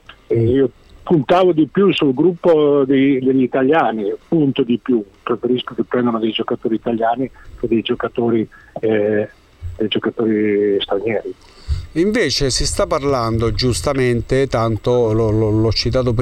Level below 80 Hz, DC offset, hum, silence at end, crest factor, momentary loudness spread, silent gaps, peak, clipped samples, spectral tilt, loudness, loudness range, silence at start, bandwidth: -34 dBFS; under 0.1%; none; 0 s; 12 dB; 9 LU; none; -4 dBFS; under 0.1%; -6 dB/octave; -17 LUFS; 5 LU; 0.1 s; 13.5 kHz